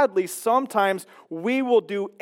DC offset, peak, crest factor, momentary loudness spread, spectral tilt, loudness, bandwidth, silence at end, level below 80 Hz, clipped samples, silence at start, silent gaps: under 0.1%; -8 dBFS; 14 dB; 10 LU; -4.5 dB/octave; -23 LUFS; 17 kHz; 0.15 s; -90 dBFS; under 0.1%; 0 s; none